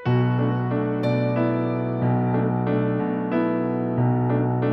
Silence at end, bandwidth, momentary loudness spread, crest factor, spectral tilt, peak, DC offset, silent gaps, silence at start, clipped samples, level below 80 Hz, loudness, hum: 0 s; 4.9 kHz; 3 LU; 12 dB; -11 dB/octave; -10 dBFS; under 0.1%; none; 0 s; under 0.1%; -54 dBFS; -23 LUFS; none